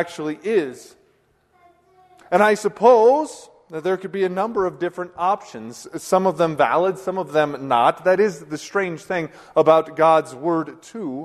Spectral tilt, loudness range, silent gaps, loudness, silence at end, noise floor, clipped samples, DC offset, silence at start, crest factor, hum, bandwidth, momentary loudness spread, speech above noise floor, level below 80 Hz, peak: -5.5 dB/octave; 3 LU; none; -20 LUFS; 0 s; -61 dBFS; under 0.1%; under 0.1%; 0 s; 20 dB; none; 13.5 kHz; 15 LU; 42 dB; -64 dBFS; -2 dBFS